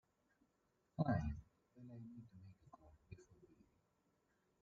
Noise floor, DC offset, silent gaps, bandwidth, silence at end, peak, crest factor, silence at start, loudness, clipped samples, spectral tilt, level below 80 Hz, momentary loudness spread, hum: -83 dBFS; under 0.1%; none; 7.2 kHz; 1.15 s; -26 dBFS; 24 dB; 1 s; -46 LUFS; under 0.1%; -8.5 dB/octave; -62 dBFS; 24 LU; none